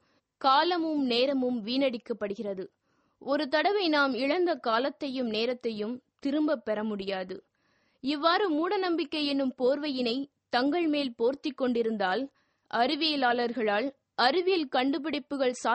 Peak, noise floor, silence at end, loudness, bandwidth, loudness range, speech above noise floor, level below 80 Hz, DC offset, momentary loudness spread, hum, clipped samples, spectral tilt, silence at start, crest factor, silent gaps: -10 dBFS; -71 dBFS; 0 s; -28 LUFS; 8.4 kHz; 3 LU; 43 dB; -74 dBFS; under 0.1%; 10 LU; none; under 0.1%; -4.5 dB/octave; 0.4 s; 20 dB; none